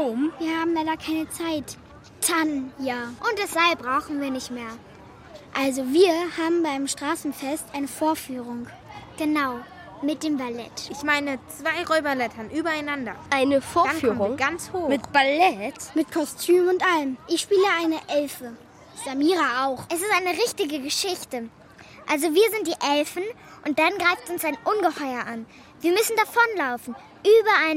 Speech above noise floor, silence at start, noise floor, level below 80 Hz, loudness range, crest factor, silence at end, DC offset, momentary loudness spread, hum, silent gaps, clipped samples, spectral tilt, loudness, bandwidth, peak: 23 dB; 0 s; -47 dBFS; -60 dBFS; 5 LU; 20 dB; 0 s; under 0.1%; 14 LU; none; none; under 0.1%; -3 dB/octave; -24 LUFS; 16 kHz; -4 dBFS